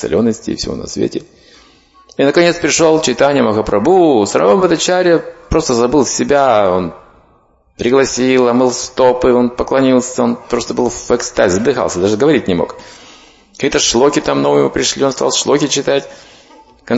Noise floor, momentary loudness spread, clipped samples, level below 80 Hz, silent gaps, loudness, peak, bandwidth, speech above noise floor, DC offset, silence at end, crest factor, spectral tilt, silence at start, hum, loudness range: -52 dBFS; 8 LU; under 0.1%; -38 dBFS; none; -13 LUFS; 0 dBFS; 8 kHz; 39 dB; under 0.1%; 0 s; 14 dB; -4 dB/octave; 0 s; none; 3 LU